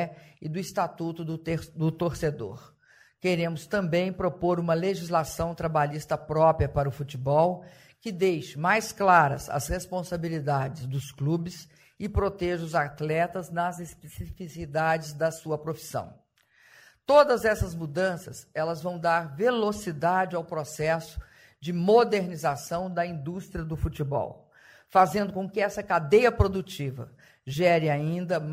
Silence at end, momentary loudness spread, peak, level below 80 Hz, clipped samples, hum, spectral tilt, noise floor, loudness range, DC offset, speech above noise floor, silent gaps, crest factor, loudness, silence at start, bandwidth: 0 s; 15 LU; -6 dBFS; -46 dBFS; under 0.1%; none; -6 dB/octave; -61 dBFS; 5 LU; under 0.1%; 35 dB; none; 22 dB; -27 LUFS; 0 s; 16 kHz